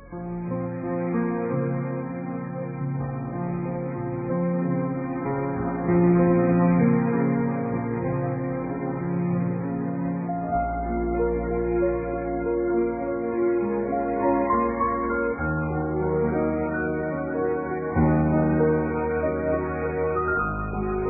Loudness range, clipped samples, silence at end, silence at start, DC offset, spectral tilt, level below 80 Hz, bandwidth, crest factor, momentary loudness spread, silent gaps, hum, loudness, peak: 6 LU; under 0.1%; 0 s; 0 s; under 0.1%; -15.5 dB/octave; -40 dBFS; 2.6 kHz; 14 dB; 9 LU; none; none; -25 LUFS; -10 dBFS